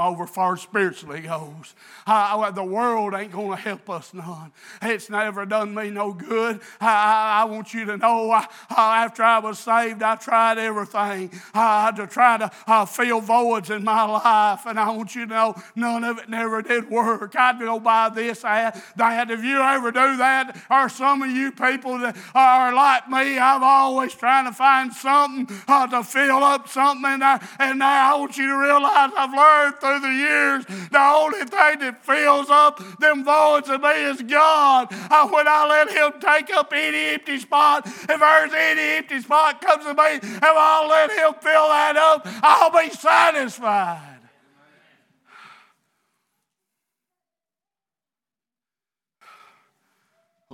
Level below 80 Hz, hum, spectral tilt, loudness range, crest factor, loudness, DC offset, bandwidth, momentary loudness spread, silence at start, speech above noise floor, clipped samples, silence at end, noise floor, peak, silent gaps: -88 dBFS; none; -3.5 dB/octave; 7 LU; 20 dB; -18 LUFS; under 0.1%; 19 kHz; 11 LU; 0 s; over 71 dB; under 0.1%; 6.5 s; under -90 dBFS; 0 dBFS; none